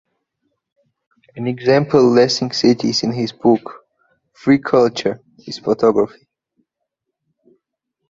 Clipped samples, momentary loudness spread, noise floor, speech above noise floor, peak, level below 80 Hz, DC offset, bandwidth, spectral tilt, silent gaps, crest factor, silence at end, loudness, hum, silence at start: under 0.1%; 13 LU; -78 dBFS; 62 dB; -2 dBFS; -58 dBFS; under 0.1%; 7.8 kHz; -5.5 dB/octave; none; 18 dB; 2.05 s; -16 LUFS; none; 1.35 s